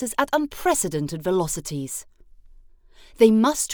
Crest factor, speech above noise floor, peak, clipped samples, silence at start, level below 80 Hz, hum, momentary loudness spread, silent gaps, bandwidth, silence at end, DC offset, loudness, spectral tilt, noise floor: 20 dB; 28 dB; -2 dBFS; under 0.1%; 0 s; -48 dBFS; none; 13 LU; none; over 20 kHz; 0 s; under 0.1%; -22 LUFS; -4.5 dB/octave; -49 dBFS